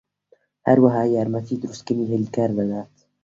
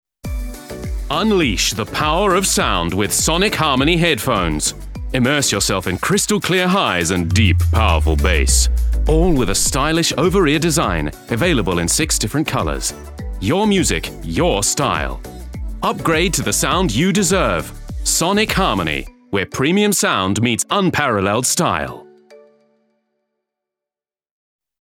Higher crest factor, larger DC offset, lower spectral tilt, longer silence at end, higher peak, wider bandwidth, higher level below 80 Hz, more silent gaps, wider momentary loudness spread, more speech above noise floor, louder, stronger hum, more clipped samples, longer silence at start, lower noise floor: about the same, 20 dB vs 16 dB; neither; first, -8 dB/octave vs -4 dB/octave; second, 0.4 s vs 2.45 s; about the same, -2 dBFS vs -2 dBFS; second, 7.6 kHz vs 18 kHz; second, -60 dBFS vs -26 dBFS; neither; first, 12 LU vs 9 LU; second, 41 dB vs over 74 dB; second, -21 LUFS vs -16 LUFS; neither; neither; first, 0.65 s vs 0.25 s; second, -61 dBFS vs under -90 dBFS